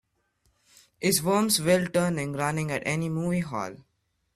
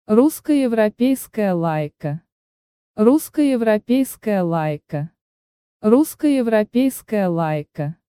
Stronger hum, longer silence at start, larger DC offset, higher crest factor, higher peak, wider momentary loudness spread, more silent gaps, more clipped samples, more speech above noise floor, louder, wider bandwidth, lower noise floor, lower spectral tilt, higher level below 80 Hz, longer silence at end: neither; first, 1 s vs 0.1 s; neither; about the same, 18 dB vs 16 dB; second, -8 dBFS vs -2 dBFS; second, 7 LU vs 12 LU; second, none vs 2.32-2.94 s, 5.21-5.80 s; neither; second, 45 dB vs over 72 dB; second, -26 LUFS vs -19 LUFS; about the same, 15.5 kHz vs 16.5 kHz; second, -71 dBFS vs under -90 dBFS; second, -4.5 dB/octave vs -6.5 dB/octave; about the same, -60 dBFS vs -60 dBFS; first, 0.6 s vs 0.15 s